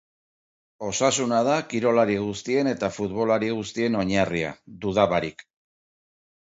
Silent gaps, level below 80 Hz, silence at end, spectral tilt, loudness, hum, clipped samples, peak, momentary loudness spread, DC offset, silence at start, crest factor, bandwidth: none; -54 dBFS; 1.15 s; -4.5 dB/octave; -24 LUFS; none; under 0.1%; -6 dBFS; 8 LU; under 0.1%; 0.8 s; 20 dB; 8 kHz